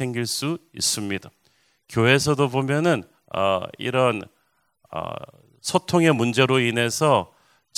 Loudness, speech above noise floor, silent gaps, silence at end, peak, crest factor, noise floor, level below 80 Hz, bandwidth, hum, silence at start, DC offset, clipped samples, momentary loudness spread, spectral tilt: -22 LUFS; 46 dB; none; 0.5 s; -2 dBFS; 22 dB; -68 dBFS; -56 dBFS; 16 kHz; none; 0 s; under 0.1%; under 0.1%; 13 LU; -4.5 dB/octave